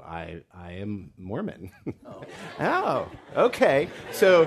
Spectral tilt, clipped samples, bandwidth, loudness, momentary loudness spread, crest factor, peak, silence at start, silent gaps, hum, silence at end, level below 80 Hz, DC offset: -5.5 dB/octave; under 0.1%; 13.5 kHz; -25 LUFS; 19 LU; 20 dB; -6 dBFS; 0.05 s; none; none; 0 s; -60 dBFS; under 0.1%